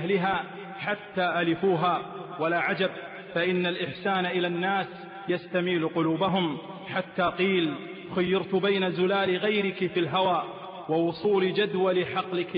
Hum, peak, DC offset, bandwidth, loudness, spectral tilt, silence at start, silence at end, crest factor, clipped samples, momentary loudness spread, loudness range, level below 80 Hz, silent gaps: none; -14 dBFS; under 0.1%; 5.2 kHz; -27 LUFS; -3.5 dB/octave; 0 s; 0 s; 12 dB; under 0.1%; 8 LU; 2 LU; -66 dBFS; none